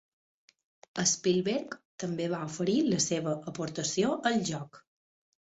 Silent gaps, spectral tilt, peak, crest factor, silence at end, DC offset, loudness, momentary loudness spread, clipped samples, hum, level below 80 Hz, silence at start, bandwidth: 1.85-1.98 s; -4 dB/octave; -12 dBFS; 20 dB; 0.8 s; under 0.1%; -30 LUFS; 12 LU; under 0.1%; none; -70 dBFS; 0.95 s; 8.4 kHz